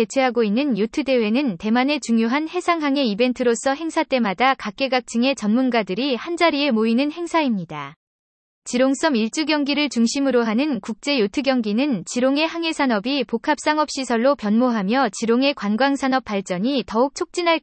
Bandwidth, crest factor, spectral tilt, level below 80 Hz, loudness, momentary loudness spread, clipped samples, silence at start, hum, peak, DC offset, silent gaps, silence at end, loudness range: 8.8 kHz; 16 dB; -4.5 dB/octave; -60 dBFS; -20 LUFS; 4 LU; under 0.1%; 0 s; none; -4 dBFS; under 0.1%; 7.96-8.62 s; 0.05 s; 2 LU